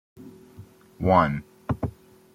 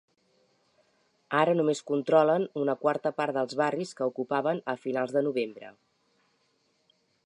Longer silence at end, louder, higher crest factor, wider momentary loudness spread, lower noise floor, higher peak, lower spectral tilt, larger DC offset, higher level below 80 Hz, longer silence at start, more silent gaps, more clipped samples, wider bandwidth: second, 0.45 s vs 1.55 s; first, -25 LUFS vs -28 LUFS; about the same, 22 dB vs 22 dB; first, 14 LU vs 9 LU; second, -49 dBFS vs -72 dBFS; about the same, -6 dBFS vs -8 dBFS; first, -8.5 dB/octave vs -6 dB/octave; neither; first, -48 dBFS vs -84 dBFS; second, 0.2 s vs 1.3 s; neither; neither; first, 15.5 kHz vs 10.5 kHz